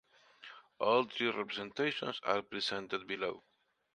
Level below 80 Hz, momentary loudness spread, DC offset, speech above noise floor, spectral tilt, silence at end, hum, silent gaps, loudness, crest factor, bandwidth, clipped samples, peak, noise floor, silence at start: -78 dBFS; 22 LU; under 0.1%; 22 dB; -4 dB/octave; 0.55 s; none; none; -35 LUFS; 22 dB; 10 kHz; under 0.1%; -16 dBFS; -57 dBFS; 0.4 s